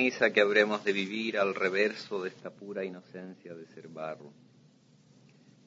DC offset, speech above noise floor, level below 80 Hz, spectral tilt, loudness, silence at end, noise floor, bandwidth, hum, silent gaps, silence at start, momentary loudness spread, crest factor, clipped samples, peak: under 0.1%; 31 dB; -82 dBFS; -4.5 dB/octave; -30 LUFS; 1.35 s; -61 dBFS; 7.8 kHz; none; none; 0 s; 22 LU; 24 dB; under 0.1%; -8 dBFS